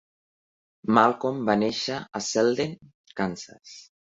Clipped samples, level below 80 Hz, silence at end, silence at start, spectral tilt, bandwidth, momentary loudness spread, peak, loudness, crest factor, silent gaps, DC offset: under 0.1%; -64 dBFS; 0.35 s; 0.85 s; -4.5 dB/octave; 8 kHz; 21 LU; -4 dBFS; -25 LUFS; 24 dB; 2.94-3.04 s; under 0.1%